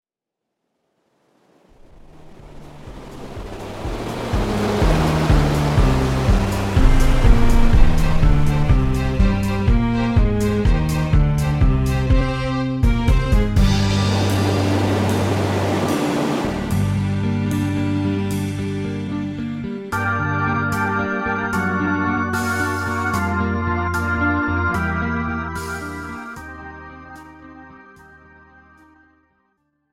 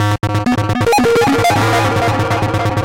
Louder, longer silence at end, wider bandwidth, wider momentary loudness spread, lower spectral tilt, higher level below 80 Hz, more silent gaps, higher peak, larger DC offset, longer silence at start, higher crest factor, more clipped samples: second, -20 LUFS vs -14 LUFS; first, 2.15 s vs 0 s; about the same, 15.5 kHz vs 16.5 kHz; first, 13 LU vs 4 LU; about the same, -6.5 dB/octave vs -5.5 dB/octave; first, -22 dBFS vs -36 dBFS; neither; first, 0 dBFS vs -6 dBFS; second, under 0.1% vs 0.6%; first, 2.2 s vs 0 s; first, 18 dB vs 6 dB; neither